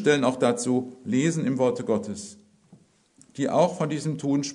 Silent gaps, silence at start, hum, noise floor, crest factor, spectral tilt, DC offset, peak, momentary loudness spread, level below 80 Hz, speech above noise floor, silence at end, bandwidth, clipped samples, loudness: none; 0 s; none; -59 dBFS; 18 dB; -5.5 dB/octave; under 0.1%; -8 dBFS; 11 LU; -70 dBFS; 34 dB; 0 s; 11 kHz; under 0.1%; -25 LUFS